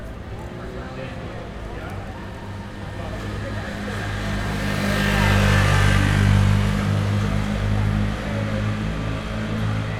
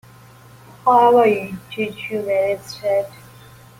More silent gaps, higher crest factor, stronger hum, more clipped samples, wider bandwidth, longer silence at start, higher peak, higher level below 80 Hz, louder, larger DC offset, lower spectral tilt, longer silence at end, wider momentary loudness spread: neither; about the same, 18 dB vs 16 dB; neither; neither; second, 14.5 kHz vs 16.5 kHz; second, 0 s vs 0.85 s; about the same, -4 dBFS vs -4 dBFS; first, -30 dBFS vs -60 dBFS; second, -22 LUFS vs -18 LUFS; neither; about the same, -6 dB/octave vs -5.5 dB/octave; second, 0 s vs 0.7 s; first, 16 LU vs 13 LU